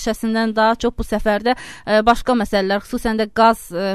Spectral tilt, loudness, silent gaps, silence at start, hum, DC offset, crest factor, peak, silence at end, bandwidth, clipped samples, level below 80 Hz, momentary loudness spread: -5 dB/octave; -18 LUFS; none; 0 s; none; 0.5%; 16 dB; -2 dBFS; 0 s; 13.5 kHz; under 0.1%; -36 dBFS; 6 LU